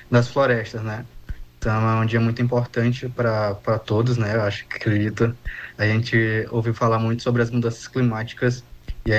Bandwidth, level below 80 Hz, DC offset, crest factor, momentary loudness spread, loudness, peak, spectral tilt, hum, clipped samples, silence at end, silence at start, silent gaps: 8.2 kHz; -42 dBFS; under 0.1%; 16 dB; 11 LU; -22 LUFS; -6 dBFS; -7 dB/octave; none; under 0.1%; 0 s; 0 s; none